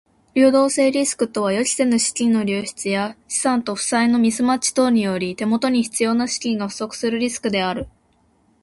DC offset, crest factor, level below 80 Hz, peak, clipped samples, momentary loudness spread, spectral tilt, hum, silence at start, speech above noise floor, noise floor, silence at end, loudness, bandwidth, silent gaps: under 0.1%; 16 dB; -56 dBFS; -4 dBFS; under 0.1%; 8 LU; -3.5 dB/octave; none; 0.35 s; 41 dB; -60 dBFS; 0.75 s; -19 LUFS; 11.5 kHz; none